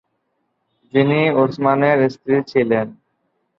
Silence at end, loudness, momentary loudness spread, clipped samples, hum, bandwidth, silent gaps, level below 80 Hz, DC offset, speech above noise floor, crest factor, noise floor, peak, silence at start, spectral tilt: 0.65 s; -17 LUFS; 6 LU; under 0.1%; none; 6.6 kHz; none; -60 dBFS; under 0.1%; 54 dB; 16 dB; -70 dBFS; -2 dBFS; 0.95 s; -8.5 dB/octave